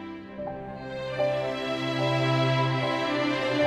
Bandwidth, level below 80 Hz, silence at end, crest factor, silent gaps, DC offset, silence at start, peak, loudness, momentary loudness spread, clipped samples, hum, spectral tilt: 10.5 kHz; -58 dBFS; 0 s; 14 dB; none; under 0.1%; 0 s; -12 dBFS; -27 LUFS; 13 LU; under 0.1%; none; -6 dB/octave